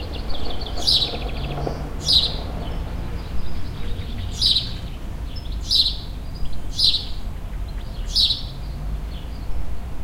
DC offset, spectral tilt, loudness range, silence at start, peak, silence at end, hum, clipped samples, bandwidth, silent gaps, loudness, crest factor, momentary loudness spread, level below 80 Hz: under 0.1%; -3.5 dB/octave; 3 LU; 0 s; -2 dBFS; 0 s; none; under 0.1%; 16 kHz; none; -22 LUFS; 22 dB; 16 LU; -30 dBFS